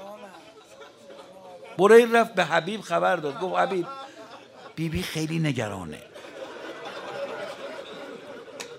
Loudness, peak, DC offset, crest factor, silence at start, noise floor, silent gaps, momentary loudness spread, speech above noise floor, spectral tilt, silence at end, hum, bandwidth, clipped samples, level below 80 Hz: -24 LUFS; -4 dBFS; under 0.1%; 24 dB; 0 s; -48 dBFS; none; 24 LU; 26 dB; -5 dB/octave; 0 s; none; 16 kHz; under 0.1%; -58 dBFS